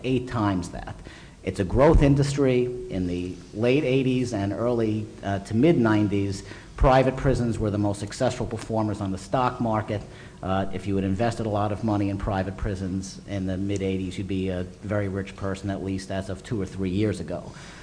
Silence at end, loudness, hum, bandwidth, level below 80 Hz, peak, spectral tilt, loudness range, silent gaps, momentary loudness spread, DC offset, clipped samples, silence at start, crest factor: 0 s; -25 LUFS; none; 10.5 kHz; -36 dBFS; -6 dBFS; -7 dB/octave; 6 LU; none; 12 LU; under 0.1%; under 0.1%; 0 s; 18 dB